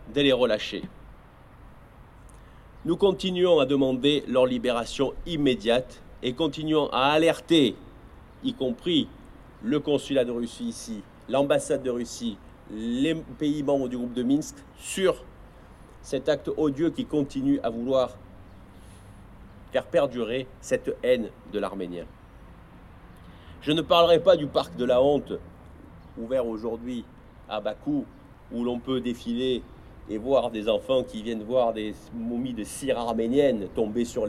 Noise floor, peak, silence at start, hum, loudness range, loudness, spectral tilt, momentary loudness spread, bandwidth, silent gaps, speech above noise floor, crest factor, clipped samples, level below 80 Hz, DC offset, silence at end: -50 dBFS; -6 dBFS; 0 s; none; 7 LU; -26 LUFS; -5 dB/octave; 14 LU; 13.5 kHz; none; 24 dB; 20 dB; under 0.1%; -50 dBFS; under 0.1%; 0 s